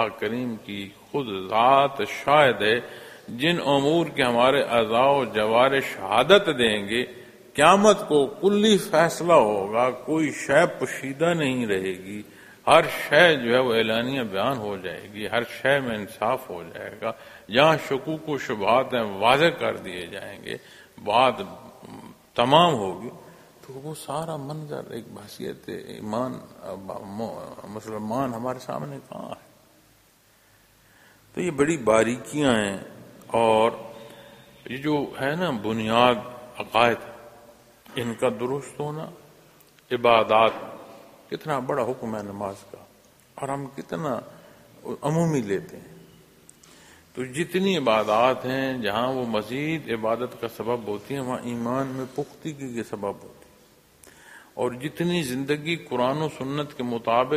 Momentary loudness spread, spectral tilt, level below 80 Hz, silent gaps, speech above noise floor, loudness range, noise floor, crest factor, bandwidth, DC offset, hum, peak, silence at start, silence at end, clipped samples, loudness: 19 LU; -5 dB/octave; -60 dBFS; none; 35 dB; 13 LU; -59 dBFS; 24 dB; 15.5 kHz; under 0.1%; none; 0 dBFS; 0 s; 0 s; under 0.1%; -23 LUFS